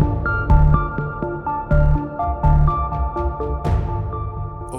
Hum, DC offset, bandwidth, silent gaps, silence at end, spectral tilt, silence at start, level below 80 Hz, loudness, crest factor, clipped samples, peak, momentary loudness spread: none; under 0.1%; 9.6 kHz; none; 0 s; -9.5 dB/octave; 0 s; -22 dBFS; -20 LUFS; 16 dB; under 0.1%; -2 dBFS; 9 LU